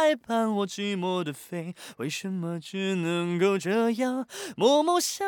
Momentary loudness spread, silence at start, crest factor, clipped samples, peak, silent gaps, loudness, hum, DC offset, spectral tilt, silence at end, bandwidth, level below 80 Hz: 13 LU; 0 s; 18 dB; under 0.1%; -10 dBFS; none; -27 LUFS; none; under 0.1%; -4.5 dB/octave; 0 s; 19 kHz; -80 dBFS